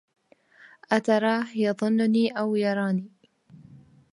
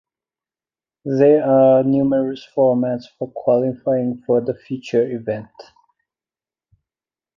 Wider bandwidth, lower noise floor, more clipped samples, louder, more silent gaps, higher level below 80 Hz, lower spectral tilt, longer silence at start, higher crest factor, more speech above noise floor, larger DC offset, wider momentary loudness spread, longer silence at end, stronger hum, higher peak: first, 11 kHz vs 7.2 kHz; second, -56 dBFS vs under -90 dBFS; neither; second, -25 LUFS vs -18 LUFS; neither; second, -76 dBFS vs -62 dBFS; second, -6.5 dB/octave vs -9 dB/octave; second, 0.9 s vs 1.05 s; about the same, 20 dB vs 16 dB; second, 32 dB vs over 73 dB; neither; second, 5 LU vs 14 LU; second, 0.35 s vs 1.75 s; neither; second, -6 dBFS vs -2 dBFS